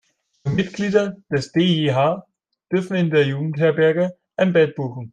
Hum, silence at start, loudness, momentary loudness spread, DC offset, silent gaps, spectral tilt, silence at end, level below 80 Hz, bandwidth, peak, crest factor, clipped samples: none; 0.45 s; -20 LUFS; 8 LU; under 0.1%; none; -7 dB/octave; 0.05 s; -58 dBFS; 9.2 kHz; -4 dBFS; 16 dB; under 0.1%